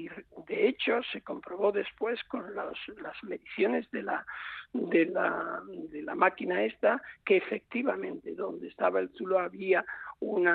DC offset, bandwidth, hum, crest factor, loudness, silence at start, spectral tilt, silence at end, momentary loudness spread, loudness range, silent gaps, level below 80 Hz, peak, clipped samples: under 0.1%; 4.6 kHz; none; 22 dB; -31 LUFS; 0 s; -8 dB/octave; 0 s; 13 LU; 4 LU; none; -72 dBFS; -10 dBFS; under 0.1%